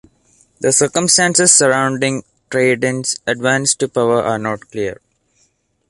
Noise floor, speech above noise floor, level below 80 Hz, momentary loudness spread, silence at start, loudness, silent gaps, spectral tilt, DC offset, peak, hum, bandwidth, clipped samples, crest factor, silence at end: -61 dBFS; 46 dB; -56 dBFS; 13 LU; 0.6 s; -14 LUFS; none; -2.5 dB/octave; under 0.1%; 0 dBFS; none; 12 kHz; under 0.1%; 16 dB; 0.95 s